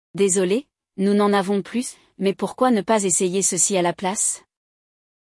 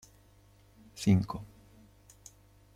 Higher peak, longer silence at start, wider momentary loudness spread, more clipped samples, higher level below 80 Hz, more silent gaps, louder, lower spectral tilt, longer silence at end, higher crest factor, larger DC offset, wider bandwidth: first, -6 dBFS vs -14 dBFS; second, 0.15 s vs 0.95 s; second, 9 LU vs 26 LU; neither; second, -66 dBFS vs -60 dBFS; neither; first, -20 LUFS vs -31 LUFS; second, -4 dB/octave vs -7 dB/octave; second, 0.85 s vs 1.3 s; about the same, 16 dB vs 20 dB; neither; second, 12 kHz vs 15 kHz